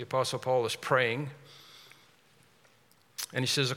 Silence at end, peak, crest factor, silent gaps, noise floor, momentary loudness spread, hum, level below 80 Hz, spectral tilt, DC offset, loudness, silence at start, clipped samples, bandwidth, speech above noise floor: 0 s; -10 dBFS; 22 dB; none; -64 dBFS; 24 LU; none; -80 dBFS; -3.5 dB/octave; under 0.1%; -30 LUFS; 0 s; under 0.1%; 18 kHz; 34 dB